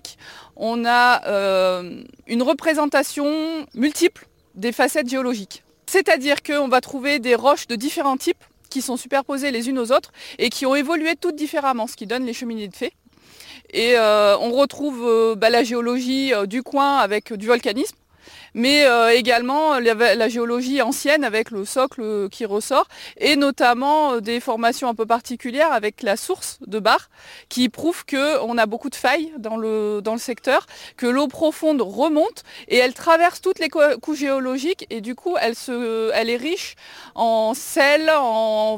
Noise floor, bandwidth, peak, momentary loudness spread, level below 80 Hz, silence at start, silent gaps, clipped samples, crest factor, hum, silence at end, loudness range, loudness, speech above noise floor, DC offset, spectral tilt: -47 dBFS; 17 kHz; -4 dBFS; 11 LU; -62 dBFS; 0.05 s; none; under 0.1%; 16 dB; none; 0 s; 4 LU; -20 LUFS; 27 dB; under 0.1%; -3 dB/octave